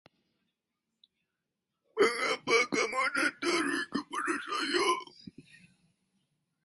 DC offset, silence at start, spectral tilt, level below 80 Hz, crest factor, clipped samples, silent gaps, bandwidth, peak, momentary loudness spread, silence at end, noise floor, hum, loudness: under 0.1%; 1.95 s; -2 dB/octave; -76 dBFS; 20 dB; under 0.1%; none; 11.5 kHz; -12 dBFS; 8 LU; 1.25 s; -86 dBFS; none; -30 LUFS